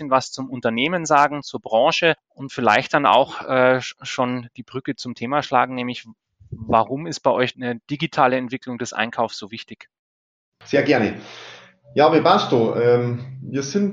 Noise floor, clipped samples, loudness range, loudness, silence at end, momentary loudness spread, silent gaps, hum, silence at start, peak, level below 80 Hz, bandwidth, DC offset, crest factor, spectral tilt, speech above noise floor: under -90 dBFS; under 0.1%; 6 LU; -20 LUFS; 0 s; 15 LU; 9.99-10.52 s; none; 0 s; -2 dBFS; -60 dBFS; 9.2 kHz; under 0.1%; 18 dB; -5 dB/octave; over 70 dB